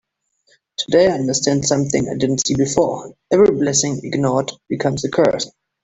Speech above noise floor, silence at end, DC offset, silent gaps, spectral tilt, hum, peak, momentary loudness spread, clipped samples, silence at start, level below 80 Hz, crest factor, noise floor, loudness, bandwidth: 45 dB; 0.35 s; under 0.1%; none; -4.5 dB/octave; none; 0 dBFS; 10 LU; under 0.1%; 0.8 s; -50 dBFS; 18 dB; -62 dBFS; -17 LUFS; 8.4 kHz